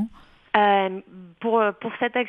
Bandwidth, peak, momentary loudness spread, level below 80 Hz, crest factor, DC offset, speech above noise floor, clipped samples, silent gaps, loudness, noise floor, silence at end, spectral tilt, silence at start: 4.9 kHz; -2 dBFS; 13 LU; -62 dBFS; 22 dB; under 0.1%; 20 dB; under 0.1%; none; -23 LUFS; -42 dBFS; 0 s; -7.5 dB/octave; 0 s